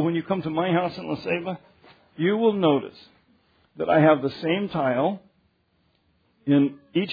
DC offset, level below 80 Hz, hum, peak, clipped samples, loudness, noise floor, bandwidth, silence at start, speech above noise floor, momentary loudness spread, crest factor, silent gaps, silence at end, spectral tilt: under 0.1%; -66 dBFS; none; -6 dBFS; under 0.1%; -23 LUFS; -67 dBFS; 5 kHz; 0 s; 44 dB; 13 LU; 18 dB; none; 0 s; -9 dB/octave